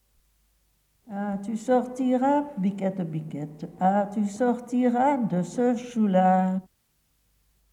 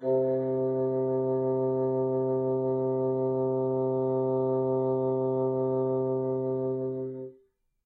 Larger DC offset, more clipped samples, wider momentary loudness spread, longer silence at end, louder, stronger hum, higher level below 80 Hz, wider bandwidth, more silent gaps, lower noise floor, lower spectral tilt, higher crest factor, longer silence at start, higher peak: neither; neither; first, 12 LU vs 3 LU; first, 1.1 s vs 0.55 s; first, -25 LUFS vs -28 LUFS; neither; about the same, -68 dBFS vs -72 dBFS; first, 11 kHz vs 2.1 kHz; neither; first, -70 dBFS vs -66 dBFS; second, -7.5 dB/octave vs -12 dB/octave; first, 16 dB vs 10 dB; first, 1.05 s vs 0 s; first, -10 dBFS vs -18 dBFS